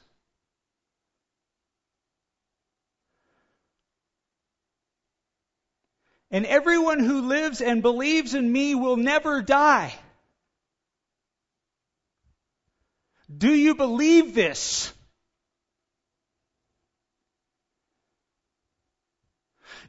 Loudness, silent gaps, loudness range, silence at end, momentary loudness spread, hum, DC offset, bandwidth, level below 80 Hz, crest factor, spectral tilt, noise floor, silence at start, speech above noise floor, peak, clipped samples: -21 LUFS; none; 9 LU; 0.1 s; 8 LU; none; under 0.1%; 8 kHz; -62 dBFS; 20 dB; -3.5 dB/octave; -85 dBFS; 6.3 s; 64 dB; -6 dBFS; under 0.1%